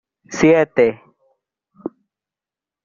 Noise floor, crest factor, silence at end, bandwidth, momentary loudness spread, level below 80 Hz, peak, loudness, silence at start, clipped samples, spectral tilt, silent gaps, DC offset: -89 dBFS; 20 dB; 0.95 s; 7.4 kHz; 20 LU; -54 dBFS; 0 dBFS; -15 LUFS; 0.3 s; under 0.1%; -5.5 dB/octave; none; under 0.1%